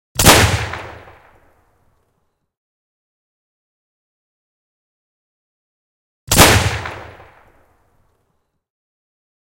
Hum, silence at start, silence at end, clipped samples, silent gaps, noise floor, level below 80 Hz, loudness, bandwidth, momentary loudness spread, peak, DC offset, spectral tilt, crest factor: none; 0.15 s; 2.4 s; under 0.1%; 2.57-6.27 s; -68 dBFS; -32 dBFS; -12 LUFS; 16.5 kHz; 22 LU; 0 dBFS; under 0.1%; -3 dB/octave; 20 dB